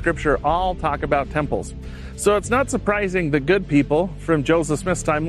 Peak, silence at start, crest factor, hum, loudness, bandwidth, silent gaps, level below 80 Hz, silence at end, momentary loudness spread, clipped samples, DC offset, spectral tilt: -4 dBFS; 0 s; 16 dB; none; -20 LUFS; 13 kHz; none; -34 dBFS; 0 s; 6 LU; under 0.1%; under 0.1%; -5.5 dB/octave